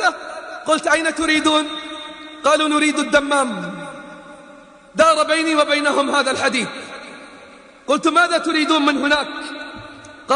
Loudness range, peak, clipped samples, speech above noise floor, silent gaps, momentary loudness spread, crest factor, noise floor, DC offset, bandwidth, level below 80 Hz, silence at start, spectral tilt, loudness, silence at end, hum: 1 LU; 0 dBFS; under 0.1%; 26 dB; none; 19 LU; 18 dB; -43 dBFS; under 0.1%; 10.5 kHz; -56 dBFS; 0 s; -2.5 dB/octave; -17 LUFS; 0 s; none